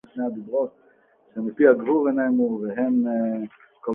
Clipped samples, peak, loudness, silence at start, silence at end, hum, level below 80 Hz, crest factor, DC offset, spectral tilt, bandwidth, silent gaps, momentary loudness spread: under 0.1%; -4 dBFS; -23 LUFS; 0.15 s; 0 s; none; -70 dBFS; 20 dB; under 0.1%; -10.5 dB/octave; 3.4 kHz; none; 14 LU